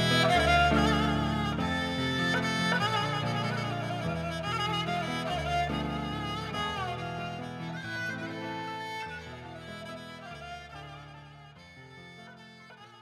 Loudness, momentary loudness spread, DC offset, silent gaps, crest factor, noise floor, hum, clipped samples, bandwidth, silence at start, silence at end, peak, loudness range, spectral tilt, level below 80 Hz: -30 LUFS; 24 LU; under 0.1%; none; 20 dB; -51 dBFS; none; under 0.1%; 15.5 kHz; 0 s; 0 s; -12 dBFS; 16 LU; -5 dB/octave; -48 dBFS